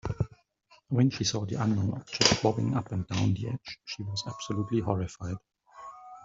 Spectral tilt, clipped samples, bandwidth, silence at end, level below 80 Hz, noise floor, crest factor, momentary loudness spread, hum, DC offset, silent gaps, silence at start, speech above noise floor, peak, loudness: -5 dB/octave; under 0.1%; 7.8 kHz; 0 s; -54 dBFS; -63 dBFS; 28 dB; 15 LU; none; under 0.1%; none; 0.05 s; 34 dB; -2 dBFS; -30 LUFS